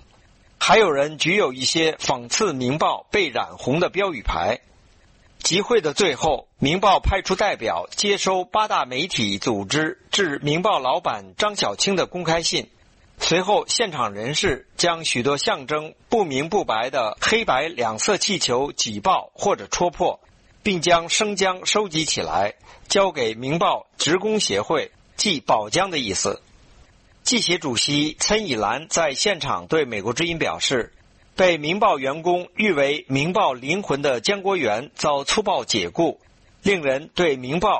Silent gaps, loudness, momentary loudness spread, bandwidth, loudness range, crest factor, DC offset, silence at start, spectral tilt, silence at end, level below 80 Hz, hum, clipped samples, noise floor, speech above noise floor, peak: none; -21 LUFS; 5 LU; 8.8 kHz; 2 LU; 18 dB; under 0.1%; 0.6 s; -3 dB/octave; 0 s; -44 dBFS; none; under 0.1%; -54 dBFS; 32 dB; -4 dBFS